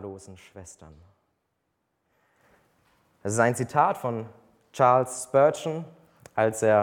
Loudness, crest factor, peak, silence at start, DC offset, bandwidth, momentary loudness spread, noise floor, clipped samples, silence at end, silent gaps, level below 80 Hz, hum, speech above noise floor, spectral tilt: -24 LUFS; 20 dB; -6 dBFS; 0 s; under 0.1%; 17 kHz; 24 LU; -77 dBFS; under 0.1%; 0 s; none; -68 dBFS; none; 52 dB; -5.5 dB/octave